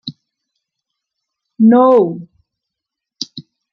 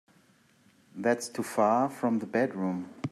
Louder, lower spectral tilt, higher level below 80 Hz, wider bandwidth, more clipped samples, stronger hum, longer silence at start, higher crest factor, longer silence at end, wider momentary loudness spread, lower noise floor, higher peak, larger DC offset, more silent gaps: first, -11 LUFS vs -29 LUFS; about the same, -6.5 dB/octave vs -6 dB/octave; first, -68 dBFS vs -78 dBFS; second, 6.6 kHz vs 14 kHz; neither; neither; second, 0.05 s vs 0.95 s; about the same, 16 dB vs 18 dB; first, 0.3 s vs 0 s; first, 21 LU vs 8 LU; first, -82 dBFS vs -63 dBFS; first, -2 dBFS vs -12 dBFS; neither; neither